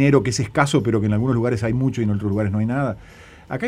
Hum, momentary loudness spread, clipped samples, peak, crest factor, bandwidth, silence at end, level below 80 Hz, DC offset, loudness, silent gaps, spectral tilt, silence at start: none; 6 LU; under 0.1%; -2 dBFS; 18 dB; 11.5 kHz; 0 s; -44 dBFS; under 0.1%; -20 LUFS; none; -6.5 dB/octave; 0 s